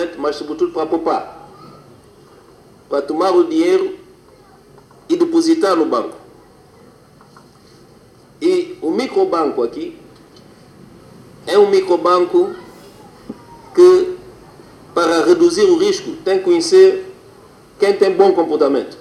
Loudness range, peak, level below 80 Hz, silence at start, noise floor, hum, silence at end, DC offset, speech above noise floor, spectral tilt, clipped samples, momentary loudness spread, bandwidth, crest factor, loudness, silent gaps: 7 LU; 0 dBFS; -58 dBFS; 0 s; -46 dBFS; none; 0.05 s; under 0.1%; 32 dB; -4.5 dB/octave; under 0.1%; 18 LU; 11.5 kHz; 16 dB; -15 LUFS; none